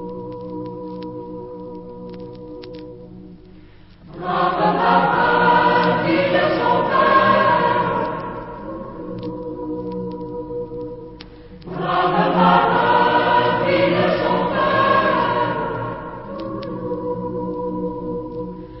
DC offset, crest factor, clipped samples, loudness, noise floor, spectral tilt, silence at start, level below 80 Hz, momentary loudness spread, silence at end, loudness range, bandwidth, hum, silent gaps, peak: under 0.1%; 18 dB; under 0.1%; -18 LUFS; -44 dBFS; -10.5 dB/octave; 0 s; -46 dBFS; 20 LU; 0 s; 14 LU; 5.8 kHz; 50 Hz at -50 dBFS; none; 0 dBFS